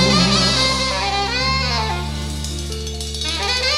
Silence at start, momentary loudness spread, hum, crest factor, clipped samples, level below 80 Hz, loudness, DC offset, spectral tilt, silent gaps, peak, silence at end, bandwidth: 0 s; 11 LU; none; 16 dB; under 0.1%; -28 dBFS; -18 LUFS; under 0.1%; -3.5 dB/octave; none; -2 dBFS; 0 s; 15.5 kHz